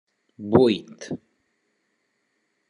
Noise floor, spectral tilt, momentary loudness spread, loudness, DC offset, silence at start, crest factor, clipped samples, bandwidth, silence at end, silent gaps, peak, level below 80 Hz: -73 dBFS; -7 dB/octave; 18 LU; -21 LUFS; under 0.1%; 0.4 s; 24 dB; under 0.1%; 10 kHz; 1.55 s; none; -2 dBFS; -68 dBFS